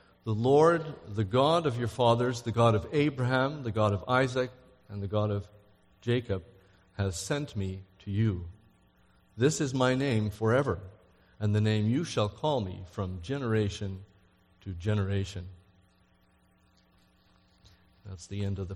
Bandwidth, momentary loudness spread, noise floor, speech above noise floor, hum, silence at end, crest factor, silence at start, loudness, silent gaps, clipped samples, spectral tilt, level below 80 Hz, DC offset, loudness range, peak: 12 kHz; 14 LU; -65 dBFS; 37 dB; none; 0 s; 20 dB; 0.25 s; -29 LUFS; none; under 0.1%; -6.5 dB/octave; -56 dBFS; under 0.1%; 11 LU; -10 dBFS